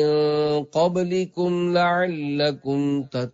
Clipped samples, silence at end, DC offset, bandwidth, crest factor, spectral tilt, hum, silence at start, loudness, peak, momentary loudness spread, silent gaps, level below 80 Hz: under 0.1%; 0.05 s; under 0.1%; 7.8 kHz; 12 dB; -6.5 dB/octave; none; 0 s; -22 LUFS; -10 dBFS; 5 LU; none; -66 dBFS